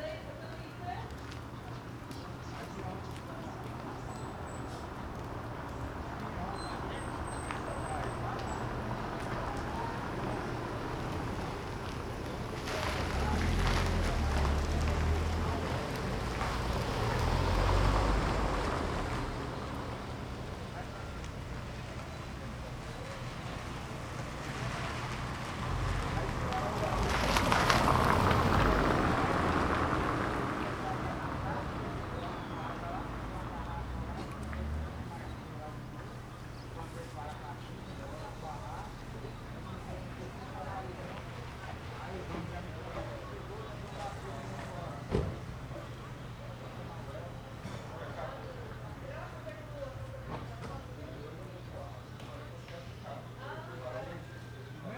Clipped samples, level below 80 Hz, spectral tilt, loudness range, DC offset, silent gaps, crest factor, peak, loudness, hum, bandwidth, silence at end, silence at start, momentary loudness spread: under 0.1%; -42 dBFS; -5.5 dB/octave; 14 LU; under 0.1%; none; 28 dB; -8 dBFS; -37 LUFS; none; over 20 kHz; 0 s; 0 s; 14 LU